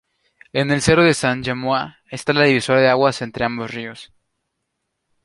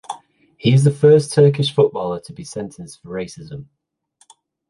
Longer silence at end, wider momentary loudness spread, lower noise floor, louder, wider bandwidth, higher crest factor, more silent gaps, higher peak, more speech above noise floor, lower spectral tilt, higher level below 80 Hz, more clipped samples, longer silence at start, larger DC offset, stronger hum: first, 1.2 s vs 1.05 s; second, 13 LU vs 22 LU; first, -76 dBFS vs -60 dBFS; second, -18 LUFS vs -15 LUFS; about the same, 11.5 kHz vs 11.5 kHz; about the same, 18 dB vs 16 dB; neither; about the same, -2 dBFS vs -2 dBFS; first, 58 dB vs 43 dB; second, -5 dB/octave vs -6.5 dB/octave; first, -48 dBFS vs -56 dBFS; neither; first, 0.55 s vs 0.1 s; neither; neither